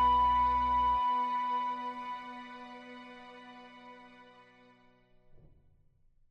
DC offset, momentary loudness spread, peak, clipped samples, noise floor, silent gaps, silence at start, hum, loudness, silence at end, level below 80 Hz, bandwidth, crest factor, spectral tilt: under 0.1%; 24 LU; -20 dBFS; under 0.1%; -65 dBFS; none; 0 s; none; -30 LUFS; 2.1 s; -52 dBFS; 6.2 kHz; 14 dB; -5.5 dB/octave